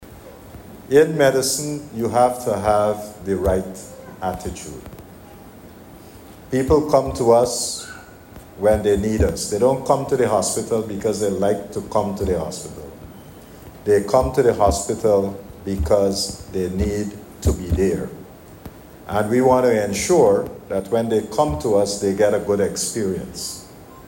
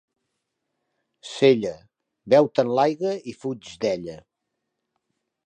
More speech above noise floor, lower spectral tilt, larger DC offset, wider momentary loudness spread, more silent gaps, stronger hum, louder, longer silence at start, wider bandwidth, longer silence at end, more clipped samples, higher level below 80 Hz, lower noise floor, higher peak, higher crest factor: second, 22 dB vs 59 dB; about the same, -5 dB/octave vs -6 dB/octave; neither; first, 19 LU vs 15 LU; neither; neither; about the same, -20 LUFS vs -22 LUFS; second, 0 s vs 1.25 s; first, 16.5 kHz vs 9.6 kHz; second, 0 s vs 1.3 s; neither; first, -36 dBFS vs -66 dBFS; second, -41 dBFS vs -80 dBFS; about the same, -4 dBFS vs -4 dBFS; about the same, 16 dB vs 20 dB